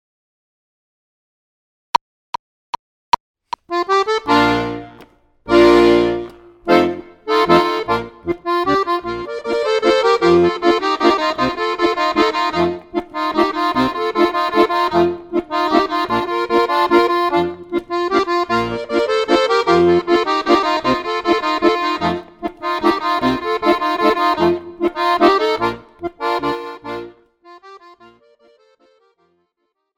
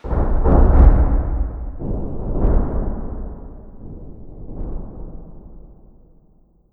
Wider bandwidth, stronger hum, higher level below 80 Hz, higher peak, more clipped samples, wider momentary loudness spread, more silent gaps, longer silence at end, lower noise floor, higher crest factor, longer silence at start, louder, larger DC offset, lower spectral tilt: first, 14 kHz vs 2.4 kHz; neither; second, -46 dBFS vs -18 dBFS; about the same, 0 dBFS vs 0 dBFS; neither; second, 12 LU vs 25 LU; neither; first, 2.2 s vs 1.05 s; first, -72 dBFS vs -53 dBFS; about the same, 16 dB vs 18 dB; first, 3.7 s vs 0.05 s; first, -16 LUFS vs -20 LUFS; neither; second, -5 dB/octave vs -12.5 dB/octave